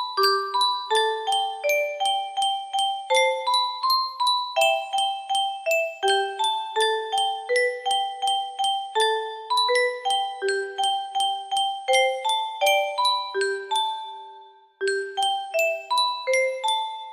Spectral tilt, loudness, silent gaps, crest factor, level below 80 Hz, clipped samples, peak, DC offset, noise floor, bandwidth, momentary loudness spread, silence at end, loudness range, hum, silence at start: 1 dB/octave; -23 LUFS; none; 16 dB; -76 dBFS; under 0.1%; -8 dBFS; under 0.1%; -48 dBFS; 15.5 kHz; 4 LU; 0 s; 2 LU; none; 0 s